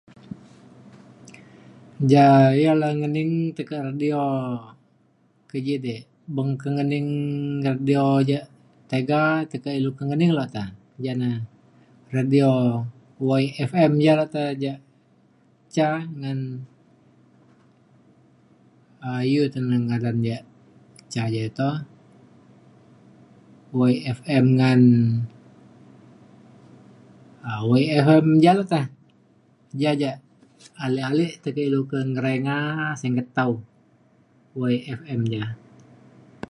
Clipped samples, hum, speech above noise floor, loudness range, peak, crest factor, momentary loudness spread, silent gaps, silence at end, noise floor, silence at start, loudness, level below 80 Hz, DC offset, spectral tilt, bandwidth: under 0.1%; none; 41 dB; 9 LU; -2 dBFS; 22 dB; 17 LU; none; 0.95 s; -62 dBFS; 2 s; -22 LUFS; -64 dBFS; under 0.1%; -8 dB/octave; 11.5 kHz